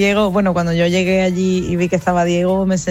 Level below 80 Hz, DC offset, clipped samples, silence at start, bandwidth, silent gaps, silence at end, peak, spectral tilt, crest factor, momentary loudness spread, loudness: -40 dBFS; under 0.1%; under 0.1%; 0 s; 13 kHz; none; 0 s; -2 dBFS; -6 dB/octave; 12 dB; 3 LU; -16 LUFS